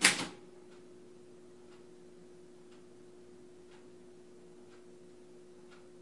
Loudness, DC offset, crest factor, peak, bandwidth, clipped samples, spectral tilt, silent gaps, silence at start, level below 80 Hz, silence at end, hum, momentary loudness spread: -32 LUFS; 0.1%; 36 dB; -6 dBFS; 11.5 kHz; under 0.1%; -0.5 dB/octave; none; 0 s; -78 dBFS; 0 s; none; 4 LU